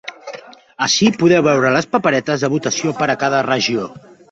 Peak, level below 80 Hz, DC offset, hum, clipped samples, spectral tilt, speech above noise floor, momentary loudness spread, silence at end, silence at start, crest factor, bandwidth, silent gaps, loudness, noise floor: 0 dBFS; -56 dBFS; under 0.1%; none; under 0.1%; -4 dB/octave; 20 dB; 18 LU; 0.35 s; 0.05 s; 16 dB; 8 kHz; none; -16 LUFS; -36 dBFS